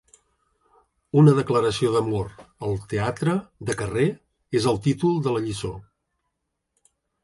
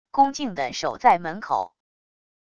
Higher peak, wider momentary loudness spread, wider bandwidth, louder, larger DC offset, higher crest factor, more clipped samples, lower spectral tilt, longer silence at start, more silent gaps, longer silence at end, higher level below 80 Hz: about the same, -4 dBFS vs -4 dBFS; first, 15 LU vs 8 LU; first, 11.5 kHz vs 7.6 kHz; about the same, -23 LUFS vs -23 LUFS; neither; about the same, 20 dB vs 20 dB; neither; first, -7 dB/octave vs -4 dB/octave; first, 1.15 s vs 0.15 s; neither; first, 1.4 s vs 0.8 s; first, -50 dBFS vs -62 dBFS